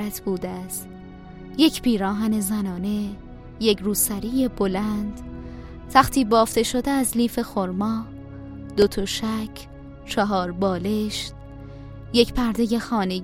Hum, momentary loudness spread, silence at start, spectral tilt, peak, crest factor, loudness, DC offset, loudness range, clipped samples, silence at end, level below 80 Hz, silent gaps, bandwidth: none; 21 LU; 0 s; -4.5 dB/octave; 0 dBFS; 22 dB; -23 LUFS; under 0.1%; 3 LU; under 0.1%; 0 s; -42 dBFS; none; 16.5 kHz